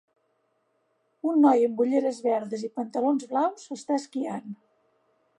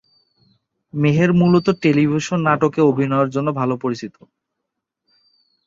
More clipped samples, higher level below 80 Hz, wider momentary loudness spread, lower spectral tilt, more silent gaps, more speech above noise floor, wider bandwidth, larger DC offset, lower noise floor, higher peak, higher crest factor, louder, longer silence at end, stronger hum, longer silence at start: neither; second, -84 dBFS vs -56 dBFS; first, 15 LU vs 10 LU; second, -6 dB/octave vs -7.5 dB/octave; neither; second, 47 dB vs 63 dB; first, 10.5 kHz vs 7.8 kHz; neither; second, -72 dBFS vs -79 dBFS; second, -8 dBFS vs -2 dBFS; about the same, 18 dB vs 16 dB; second, -26 LUFS vs -17 LUFS; second, 0.85 s vs 1.55 s; neither; first, 1.25 s vs 0.95 s